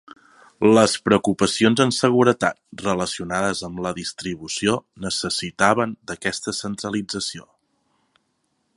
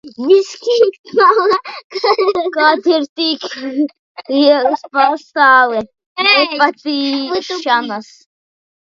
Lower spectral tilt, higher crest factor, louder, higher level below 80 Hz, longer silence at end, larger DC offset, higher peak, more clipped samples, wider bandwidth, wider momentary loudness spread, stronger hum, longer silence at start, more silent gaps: about the same, -4 dB/octave vs -3 dB/octave; first, 22 dB vs 14 dB; second, -21 LUFS vs -13 LUFS; first, -54 dBFS vs -64 dBFS; first, 1.35 s vs 0.8 s; neither; about the same, 0 dBFS vs 0 dBFS; neither; first, 11.5 kHz vs 7.6 kHz; about the same, 11 LU vs 11 LU; neither; first, 0.6 s vs 0.05 s; second, none vs 0.99-1.04 s, 1.84-1.90 s, 3.09-3.16 s, 3.99-4.15 s, 6.06-6.16 s